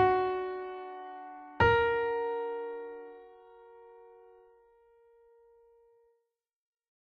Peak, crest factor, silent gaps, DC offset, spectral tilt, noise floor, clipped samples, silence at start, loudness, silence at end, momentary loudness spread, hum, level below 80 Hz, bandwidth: -12 dBFS; 22 dB; none; under 0.1%; -7.5 dB/octave; -80 dBFS; under 0.1%; 0 s; -31 LUFS; 2.9 s; 26 LU; none; -56 dBFS; 6.6 kHz